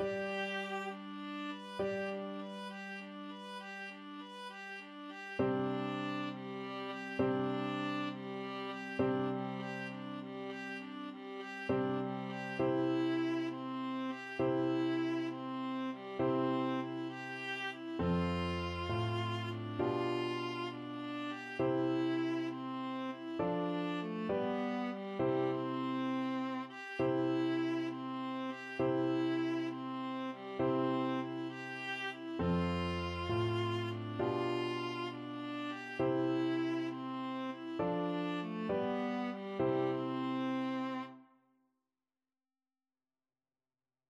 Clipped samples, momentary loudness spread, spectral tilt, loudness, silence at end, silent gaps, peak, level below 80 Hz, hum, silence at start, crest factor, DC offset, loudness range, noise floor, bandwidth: under 0.1%; 9 LU; -7 dB/octave; -38 LUFS; 2.85 s; none; -22 dBFS; -66 dBFS; none; 0 s; 16 dB; under 0.1%; 5 LU; under -90 dBFS; 11 kHz